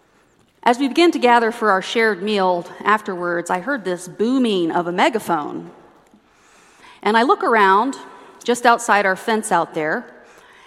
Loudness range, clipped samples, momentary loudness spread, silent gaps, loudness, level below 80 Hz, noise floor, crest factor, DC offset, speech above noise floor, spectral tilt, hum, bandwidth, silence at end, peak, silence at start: 4 LU; under 0.1%; 9 LU; none; -18 LUFS; -68 dBFS; -57 dBFS; 18 dB; under 0.1%; 39 dB; -4 dB/octave; none; 15 kHz; 0.55 s; 0 dBFS; 0.65 s